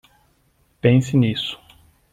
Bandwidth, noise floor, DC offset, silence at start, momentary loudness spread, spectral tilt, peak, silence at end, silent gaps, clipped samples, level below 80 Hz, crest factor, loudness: 9.6 kHz; -62 dBFS; under 0.1%; 0.85 s; 12 LU; -7 dB/octave; -2 dBFS; 0.55 s; none; under 0.1%; -54 dBFS; 20 dB; -19 LUFS